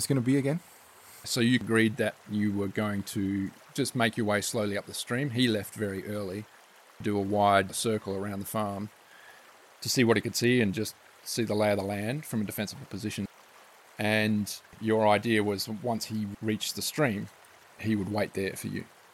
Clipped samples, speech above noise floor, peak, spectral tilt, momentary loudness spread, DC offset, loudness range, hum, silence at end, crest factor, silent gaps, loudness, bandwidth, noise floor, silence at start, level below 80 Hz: under 0.1%; 26 dB; -10 dBFS; -5 dB/octave; 12 LU; under 0.1%; 3 LU; none; 0.25 s; 20 dB; none; -29 LUFS; 16.5 kHz; -55 dBFS; 0 s; -70 dBFS